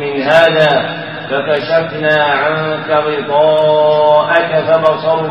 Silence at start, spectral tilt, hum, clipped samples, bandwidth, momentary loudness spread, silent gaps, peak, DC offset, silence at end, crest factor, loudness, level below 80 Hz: 0 s; -6 dB/octave; none; under 0.1%; 7.8 kHz; 6 LU; none; 0 dBFS; 0.4%; 0 s; 12 dB; -12 LUFS; -56 dBFS